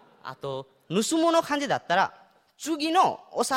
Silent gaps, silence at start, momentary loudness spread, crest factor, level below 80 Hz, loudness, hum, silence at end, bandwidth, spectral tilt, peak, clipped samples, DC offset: none; 0.25 s; 15 LU; 18 dB; -72 dBFS; -26 LUFS; none; 0 s; 16 kHz; -3.5 dB/octave; -8 dBFS; under 0.1%; under 0.1%